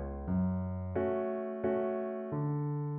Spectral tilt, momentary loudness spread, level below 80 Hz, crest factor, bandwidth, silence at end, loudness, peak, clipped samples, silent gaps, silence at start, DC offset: -10 dB/octave; 4 LU; -52 dBFS; 12 dB; 3.3 kHz; 0 s; -35 LUFS; -22 dBFS; under 0.1%; none; 0 s; under 0.1%